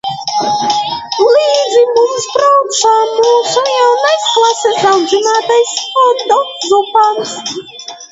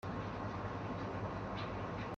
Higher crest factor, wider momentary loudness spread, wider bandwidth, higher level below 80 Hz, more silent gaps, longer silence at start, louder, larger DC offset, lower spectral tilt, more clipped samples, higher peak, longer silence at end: about the same, 12 dB vs 12 dB; first, 7 LU vs 1 LU; about the same, 8 kHz vs 7.6 kHz; about the same, -60 dBFS vs -56 dBFS; neither; about the same, 0.05 s vs 0.05 s; first, -11 LUFS vs -42 LUFS; neither; second, -1.5 dB/octave vs -7.5 dB/octave; neither; first, 0 dBFS vs -28 dBFS; about the same, 0.05 s vs 0 s